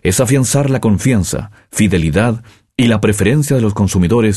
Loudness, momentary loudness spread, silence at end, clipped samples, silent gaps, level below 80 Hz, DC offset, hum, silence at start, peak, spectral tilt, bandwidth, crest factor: -14 LUFS; 8 LU; 0 s; under 0.1%; none; -34 dBFS; under 0.1%; none; 0.05 s; -2 dBFS; -5.5 dB/octave; 13 kHz; 12 dB